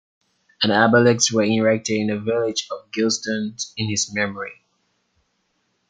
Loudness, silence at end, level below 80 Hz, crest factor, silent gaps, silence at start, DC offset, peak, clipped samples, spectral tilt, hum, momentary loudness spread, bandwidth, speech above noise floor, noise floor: -20 LUFS; 1.35 s; -64 dBFS; 20 dB; none; 0.6 s; under 0.1%; -2 dBFS; under 0.1%; -3.5 dB/octave; none; 12 LU; 9.6 kHz; 50 dB; -70 dBFS